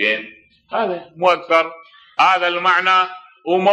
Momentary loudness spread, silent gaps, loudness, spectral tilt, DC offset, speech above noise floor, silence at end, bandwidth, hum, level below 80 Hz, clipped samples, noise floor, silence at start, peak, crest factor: 12 LU; none; -17 LUFS; -4 dB/octave; under 0.1%; 24 dB; 0 s; 9.4 kHz; none; -72 dBFS; under 0.1%; -40 dBFS; 0 s; -2 dBFS; 16 dB